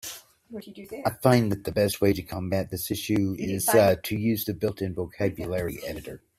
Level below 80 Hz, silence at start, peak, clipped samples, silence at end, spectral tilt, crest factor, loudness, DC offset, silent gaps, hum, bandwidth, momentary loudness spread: -54 dBFS; 0.05 s; -4 dBFS; under 0.1%; 0.2 s; -5.5 dB/octave; 22 dB; -26 LUFS; under 0.1%; none; none; 16 kHz; 17 LU